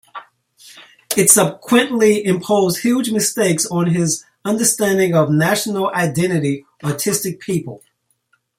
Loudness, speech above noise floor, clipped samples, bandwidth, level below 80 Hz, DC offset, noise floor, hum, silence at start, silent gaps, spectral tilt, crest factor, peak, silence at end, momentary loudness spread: -16 LUFS; 47 dB; under 0.1%; 16.5 kHz; -58 dBFS; under 0.1%; -64 dBFS; none; 0.15 s; none; -4 dB/octave; 18 dB; 0 dBFS; 0.8 s; 10 LU